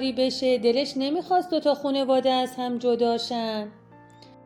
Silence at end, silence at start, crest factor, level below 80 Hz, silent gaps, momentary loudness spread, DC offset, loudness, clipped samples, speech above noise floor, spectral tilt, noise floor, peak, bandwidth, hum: 0.5 s; 0 s; 14 dB; -66 dBFS; none; 7 LU; under 0.1%; -24 LUFS; under 0.1%; 26 dB; -4.5 dB/octave; -50 dBFS; -10 dBFS; 13.5 kHz; none